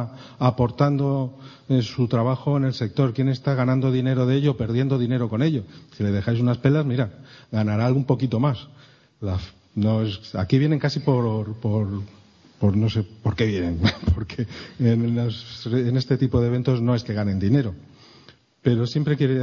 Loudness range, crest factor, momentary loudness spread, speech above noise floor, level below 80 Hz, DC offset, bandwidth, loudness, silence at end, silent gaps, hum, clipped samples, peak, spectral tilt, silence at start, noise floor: 2 LU; 18 dB; 9 LU; 31 dB; -44 dBFS; under 0.1%; 7 kHz; -23 LUFS; 0 s; none; none; under 0.1%; -4 dBFS; -8.5 dB/octave; 0 s; -52 dBFS